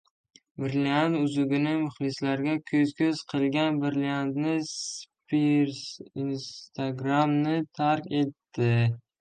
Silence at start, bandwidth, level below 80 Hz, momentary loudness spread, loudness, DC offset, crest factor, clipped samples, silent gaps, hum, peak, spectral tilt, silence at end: 0.6 s; 9.4 kHz; -68 dBFS; 9 LU; -27 LUFS; under 0.1%; 16 dB; under 0.1%; none; none; -10 dBFS; -6 dB/octave; 0.2 s